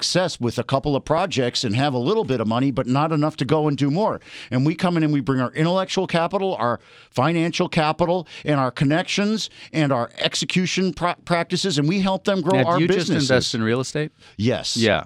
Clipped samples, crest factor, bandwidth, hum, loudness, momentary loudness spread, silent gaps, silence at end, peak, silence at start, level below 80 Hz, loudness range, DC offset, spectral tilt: under 0.1%; 18 dB; 12.5 kHz; none; -21 LUFS; 5 LU; none; 0 s; -4 dBFS; 0 s; -52 dBFS; 1 LU; under 0.1%; -5.5 dB/octave